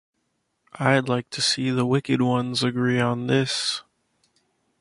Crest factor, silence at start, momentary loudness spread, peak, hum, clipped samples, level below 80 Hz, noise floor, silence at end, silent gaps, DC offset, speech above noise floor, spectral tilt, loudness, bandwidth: 20 dB; 0.75 s; 4 LU; -4 dBFS; none; under 0.1%; -64 dBFS; -74 dBFS; 1 s; none; under 0.1%; 51 dB; -5 dB/octave; -23 LUFS; 11.5 kHz